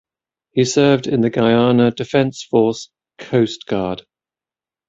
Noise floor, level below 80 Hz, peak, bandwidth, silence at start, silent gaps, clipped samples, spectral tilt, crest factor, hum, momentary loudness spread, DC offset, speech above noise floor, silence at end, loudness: under -90 dBFS; -54 dBFS; -2 dBFS; 7.8 kHz; 0.55 s; none; under 0.1%; -6 dB/octave; 16 dB; none; 9 LU; under 0.1%; over 74 dB; 0.9 s; -17 LUFS